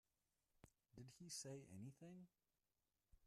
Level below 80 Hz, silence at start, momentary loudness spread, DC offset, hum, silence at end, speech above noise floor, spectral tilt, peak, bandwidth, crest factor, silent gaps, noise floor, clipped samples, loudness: -84 dBFS; 0.55 s; 12 LU; under 0.1%; none; 0 s; over 32 dB; -4 dB/octave; -42 dBFS; 13 kHz; 20 dB; none; under -90 dBFS; under 0.1%; -58 LUFS